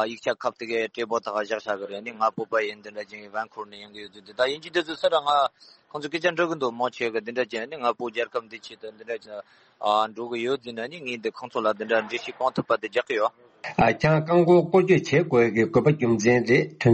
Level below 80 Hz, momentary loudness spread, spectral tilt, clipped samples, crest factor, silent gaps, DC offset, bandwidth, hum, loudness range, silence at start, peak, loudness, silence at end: -60 dBFS; 17 LU; -6 dB/octave; under 0.1%; 18 dB; none; under 0.1%; 8.4 kHz; none; 9 LU; 0 s; -8 dBFS; -24 LUFS; 0 s